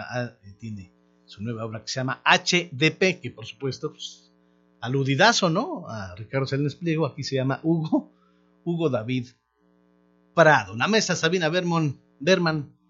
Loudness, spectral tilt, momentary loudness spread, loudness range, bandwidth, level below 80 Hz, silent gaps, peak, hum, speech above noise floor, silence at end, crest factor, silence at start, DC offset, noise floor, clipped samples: -24 LUFS; -4.5 dB/octave; 18 LU; 4 LU; 7.8 kHz; -66 dBFS; none; 0 dBFS; 60 Hz at -50 dBFS; 40 dB; 0.25 s; 24 dB; 0 s; under 0.1%; -64 dBFS; under 0.1%